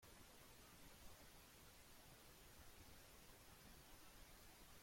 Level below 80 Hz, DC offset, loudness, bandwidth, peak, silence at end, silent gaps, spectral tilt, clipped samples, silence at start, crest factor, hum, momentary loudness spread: -72 dBFS; under 0.1%; -64 LUFS; 16.5 kHz; -48 dBFS; 0 s; none; -3 dB/octave; under 0.1%; 0 s; 16 dB; none; 1 LU